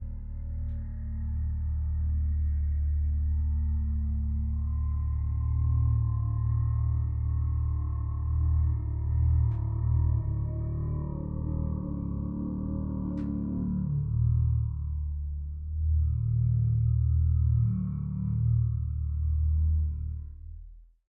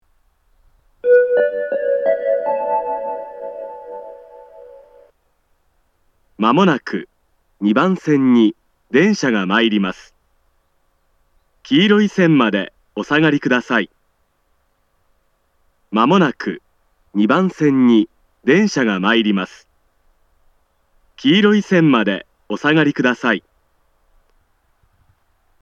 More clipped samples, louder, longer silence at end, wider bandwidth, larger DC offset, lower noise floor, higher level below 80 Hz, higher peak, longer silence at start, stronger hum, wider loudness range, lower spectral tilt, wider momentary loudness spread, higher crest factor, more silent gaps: neither; second, -30 LUFS vs -16 LUFS; second, 0.25 s vs 2.2 s; second, 2 kHz vs 7.8 kHz; neither; second, -48 dBFS vs -64 dBFS; first, -32 dBFS vs -62 dBFS; second, -16 dBFS vs 0 dBFS; second, 0 s vs 1.05 s; neither; about the same, 4 LU vs 6 LU; first, -14.5 dB/octave vs -6 dB/octave; second, 9 LU vs 15 LU; second, 12 dB vs 18 dB; neither